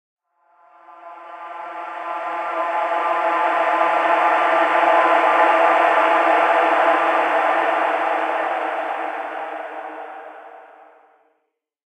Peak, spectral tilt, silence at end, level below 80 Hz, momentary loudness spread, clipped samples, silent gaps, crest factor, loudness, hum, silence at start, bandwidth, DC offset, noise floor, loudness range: -2 dBFS; -3 dB/octave; 1.35 s; under -90 dBFS; 18 LU; under 0.1%; none; 18 dB; -18 LUFS; none; 0.9 s; 10 kHz; under 0.1%; -73 dBFS; 11 LU